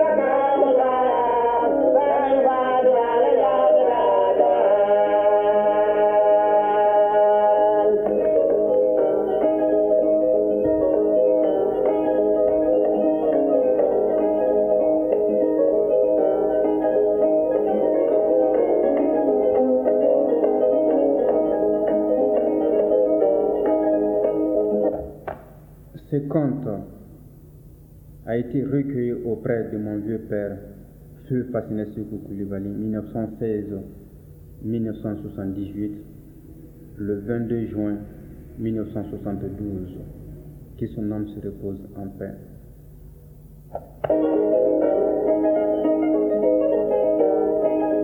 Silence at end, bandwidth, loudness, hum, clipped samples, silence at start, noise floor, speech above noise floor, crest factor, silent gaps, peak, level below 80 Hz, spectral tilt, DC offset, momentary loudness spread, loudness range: 0 s; 3.7 kHz; -20 LUFS; none; under 0.1%; 0 s; -45 dBFS; 18 dB; 14 dB; none; -6 dBFS; -50 dBFS; -9.5 dB/octave; under 0.1%; 14 LU; 13 LU